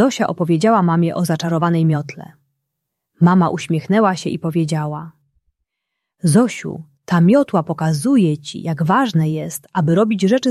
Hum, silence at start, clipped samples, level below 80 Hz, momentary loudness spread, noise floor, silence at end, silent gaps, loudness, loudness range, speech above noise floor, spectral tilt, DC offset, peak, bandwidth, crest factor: none; 0 s; under 0.1%; -60 dBFS; 11 LU; -78 dBFS; 0 s; none; -17 LUFS; 3 LU; 62 dB; -6.5 dB/octave; under 0.1%; -2 dBFS; 13 kHz; 14 dB